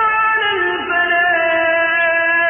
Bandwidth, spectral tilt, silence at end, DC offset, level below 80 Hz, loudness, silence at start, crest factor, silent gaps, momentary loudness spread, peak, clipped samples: 3.6 kHz; -8 dB/octave; 0 s; under 0.1%; -52 dBFS; -14 LUFS; 0 s; 10 dB; none; 3 LU; -6 dBFS; under 0.1%